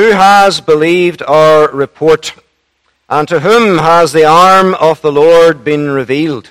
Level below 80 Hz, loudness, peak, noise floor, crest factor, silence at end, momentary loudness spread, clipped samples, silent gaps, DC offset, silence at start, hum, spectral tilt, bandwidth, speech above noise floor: -46 dBFS; -8 LUFS; 0 dBFS; -59 dBFS; 8 dB; 0.1 s; 8 LU; 3%; none; under 0.1%; 0 s; none; -5 dB/octave; 15.5 kHz; 52 dB